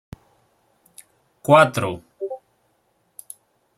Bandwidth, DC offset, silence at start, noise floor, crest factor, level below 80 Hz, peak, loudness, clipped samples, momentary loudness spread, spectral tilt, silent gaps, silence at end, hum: 16 kHz; under 0.1%; 1.45 s; -66 dBFS; 22 dB; -60 dBFS; -2 dBFS; -19 LUFS; under 0.1%; 26 LU; -5.5 dB/octave; none; 1.4 s; none